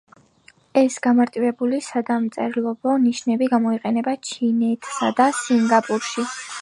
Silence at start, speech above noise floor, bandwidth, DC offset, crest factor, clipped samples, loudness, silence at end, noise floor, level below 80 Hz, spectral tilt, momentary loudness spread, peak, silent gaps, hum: 0.75 s; 35 dB; 11.5 kHz; under 0.1%; 18 dB; under 0.1%; -21 LUFS; 0 s; -55 dBFS; -72 dBFS; -4.5 dB/octave; 6 LU; -2 dBFS; none; none